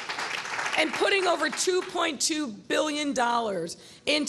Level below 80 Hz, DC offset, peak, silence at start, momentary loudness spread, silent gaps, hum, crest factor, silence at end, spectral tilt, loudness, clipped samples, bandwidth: -68 dBFS; under 0.1%; -8 dBFS; 0 s; 8 LU; none; none; 18 dB; 0 s; -1.5 dB/octave; -26 LUFS; under 0.1%; 13 kHz